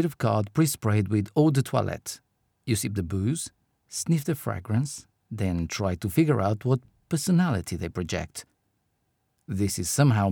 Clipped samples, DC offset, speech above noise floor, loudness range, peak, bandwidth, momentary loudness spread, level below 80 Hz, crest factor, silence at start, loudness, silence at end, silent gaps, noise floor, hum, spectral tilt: under 0.1%; under 0.1%; 49 dB; 3 LU; -8 dBFS; 20 kHz; 13 LU; -52 dBFS; 18 dB; 0 s; -26 LUFS; 0 s; none; -74 dBFS; none; -6 dB/octave